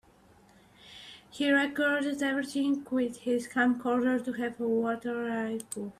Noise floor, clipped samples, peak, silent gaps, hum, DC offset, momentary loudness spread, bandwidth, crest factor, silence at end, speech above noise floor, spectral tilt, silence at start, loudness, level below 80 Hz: -60 dBFS; under 0.1%; -14 dBFS; none; none; under 0.1%; 11 LU; 15 kHz; 16 dB; 0.05 s; 30 dB; -4 dB/octave; 0.85 s; -30 LUFS; -70 dBFS